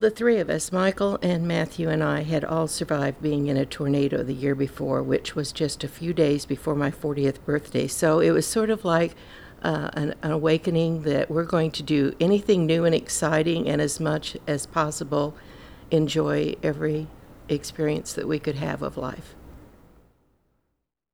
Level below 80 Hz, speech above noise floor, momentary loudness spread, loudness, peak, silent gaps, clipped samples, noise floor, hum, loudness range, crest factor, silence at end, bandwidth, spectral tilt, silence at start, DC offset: -50 dBFS; 54 dB; 8 LU; -25 LUFS; -6 dBFS; none; under 0.1%; -78 dBFS; none; 5 LU; 18 dB; 1.5 s; 18 kHz; -5.5 dB/octave; 0 s; under 0.1%